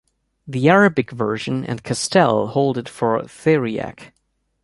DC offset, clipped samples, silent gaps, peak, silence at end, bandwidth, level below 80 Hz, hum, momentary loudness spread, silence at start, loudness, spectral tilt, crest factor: under 0.1%; under 0.1%; none; -2 dBFS; 0.55 s; 11.5 kHz; -56 dBFS; none; 11 LU; 0.45 s; -19 LUFS; -5.5 dB/octave; 18 dB